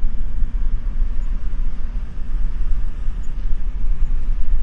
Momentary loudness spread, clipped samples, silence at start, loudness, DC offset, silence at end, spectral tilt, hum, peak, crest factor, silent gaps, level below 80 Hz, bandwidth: 4 LU; under 0.1%; 0 s; -28 LUFS; under 0.1%; 0 s; -8 dB/octave; none; -4 dBFS; 10 dB; none; -18 dBFS; 2 kHz